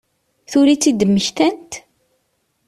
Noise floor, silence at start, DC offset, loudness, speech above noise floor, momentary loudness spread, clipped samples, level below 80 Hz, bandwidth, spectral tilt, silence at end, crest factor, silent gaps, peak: -67 dBFS; 0.5 s; under 0.1%; -15 LUFS; 52 dB; 19 LU; under 0.1%; -56 dBFS; 13.5 kHz; -4.5 dB/octave; 0.9 s; 14 dB; none; -4 dBFS